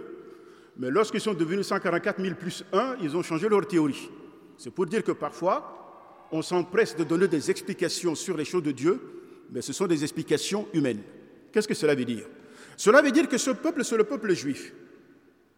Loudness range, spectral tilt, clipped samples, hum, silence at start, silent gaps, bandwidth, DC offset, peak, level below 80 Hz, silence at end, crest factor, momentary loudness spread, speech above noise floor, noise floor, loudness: 4 LU; -4.5 dB/octave; under 0.1%; none; 0 s; none; 16 kHz; under 0.1%; -6 dBFS; -78 dBFS; 0.7 s; 22 dB; 14 LU; 32 dB; -58 dBFS; -27 LUFS